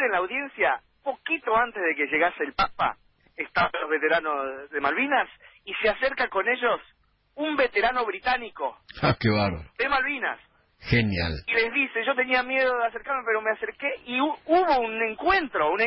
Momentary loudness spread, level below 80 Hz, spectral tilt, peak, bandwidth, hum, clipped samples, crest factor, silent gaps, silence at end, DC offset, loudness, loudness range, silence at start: 8 LU; -48 dBFS; -9.5 dB/octave; -8 dBFS; 5.8 kHz; none; under 0.1%; 18 dB; none; 0 s; under 0.1%; -25 LUFS; 2 LU; 0 s